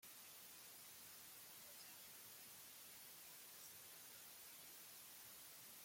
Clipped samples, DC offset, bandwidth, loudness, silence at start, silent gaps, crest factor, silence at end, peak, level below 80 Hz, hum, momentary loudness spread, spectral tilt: under 0.1%; under 0.1%; 16.5 kHz; -57 LUFS; 0 s; none; 14 dB; 0 s; -46 dBFS; under -90 dBFS; none; 1 LU; 0 dB/octave